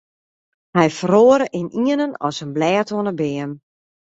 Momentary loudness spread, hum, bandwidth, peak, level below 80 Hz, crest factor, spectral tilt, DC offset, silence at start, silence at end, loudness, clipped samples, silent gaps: 12 LU; none; 8 kHz; -2 dBFS; -60 dBFS; 18 dB; -6 dB/octave; under 0.1%; 0.75 s; 0.6 s; -18 LUFS; under 0.1%; none